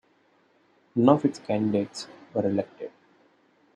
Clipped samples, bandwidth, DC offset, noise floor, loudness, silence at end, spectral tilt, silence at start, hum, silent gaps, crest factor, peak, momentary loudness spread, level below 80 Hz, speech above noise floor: under 0.1%; 10 kHz; under 0.1%; -64 dBFS; -26 LUFS; 0.85 s; -7 dB/octave; 0.95 s; none; none; 24 dB; -4 dBFS; 18 LU; -72 dBFS; 39 dB